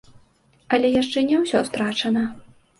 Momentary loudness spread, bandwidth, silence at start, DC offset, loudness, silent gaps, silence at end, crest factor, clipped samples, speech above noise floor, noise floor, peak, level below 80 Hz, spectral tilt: 5 LU; 11.5 kHz; 0.7 s; under 0.1%; -21 LUFS; none; 0.4 s; 16 dB; under 0.1%; 38 dB; -58 dBFS; -6 dBFS; -58 dBFS; -4.5 dB/octave